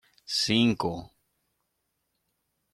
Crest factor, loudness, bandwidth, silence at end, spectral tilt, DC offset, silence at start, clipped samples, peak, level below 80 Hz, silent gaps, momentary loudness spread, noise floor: 20 dB; -26 LUFS; 13.5 kHz; 1.7 s; -4 dB/octave; under 0.1%; 0.3 s; under 0.1%; -12 dBFS; -62 dBFS; none; 11 LU; -79 dBFS